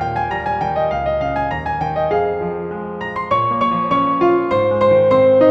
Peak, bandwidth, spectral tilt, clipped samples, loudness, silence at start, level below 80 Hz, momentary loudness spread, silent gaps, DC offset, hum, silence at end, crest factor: -2 dBFS; 6.2 kHz; -8 dB/octave; under 0.1%; -17 LUFS; 0 s; -40 dBFS; 11 LU; none; under 0.1%; none; 0 s; 16 dB